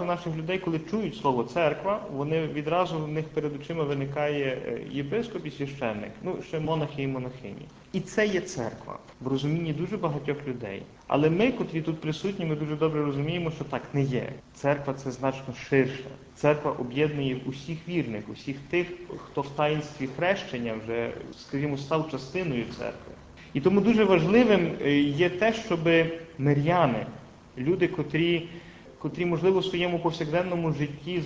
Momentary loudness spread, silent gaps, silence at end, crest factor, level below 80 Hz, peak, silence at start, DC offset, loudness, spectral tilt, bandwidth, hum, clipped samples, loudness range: 13 LU; none; 0 s; 20 dB; -56 dBFS; -8 dBFS; 0 s; under 0.1%; -28 LUFS; -7 dB/octave; 8 kHz; none; under 0.1%; 7 LU